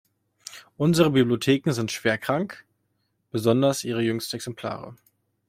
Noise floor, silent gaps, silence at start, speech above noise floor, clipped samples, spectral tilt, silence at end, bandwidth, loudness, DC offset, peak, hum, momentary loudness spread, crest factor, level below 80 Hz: -73 dBFS; none; 0.5 s; 50 dB; under 0.1%; -5.5 dB/octave; 0.55 s; 16.5 kHz; -24 LUFS; under 0.1%; -4 dBFS; none; 21 LU; 20 dB; -62 dBFS